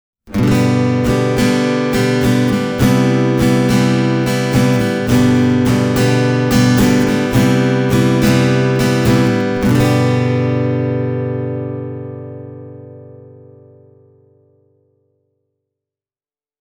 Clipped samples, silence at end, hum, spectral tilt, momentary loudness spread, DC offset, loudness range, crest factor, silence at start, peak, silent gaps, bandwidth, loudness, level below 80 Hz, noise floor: under 0.1%; 3.45 s; none; -6.5 dB/octave; 10 LU; under 0.1%; 10 LU; 14 dB; 0.25 s; 0 dBFS; none; over 20 kHz; -14 LUFS; -36 dBFS; under -90 dBFS